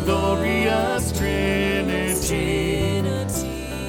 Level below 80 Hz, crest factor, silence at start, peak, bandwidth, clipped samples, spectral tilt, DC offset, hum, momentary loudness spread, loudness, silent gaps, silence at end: -32 dBFS; 14 dB; 0 s; -8 dBFS; 18 kHz; under 0.1%; -5 dB/octave; under 0.1%; none; 4 LU; -22 LUFS; none; 0 s